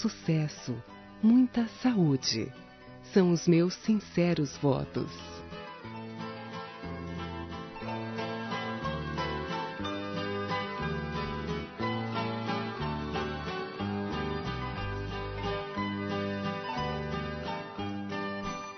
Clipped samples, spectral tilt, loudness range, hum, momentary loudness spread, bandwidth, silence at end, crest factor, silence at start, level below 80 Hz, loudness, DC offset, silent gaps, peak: under 0.1%; -5.5 dB/octave; 9 LU; none; 14 LU; 6.2 kHz; 0 s; 20 dB; 0 s; -52 dBFS; -32 LUFS; under 0.1%; none; -12 dBFS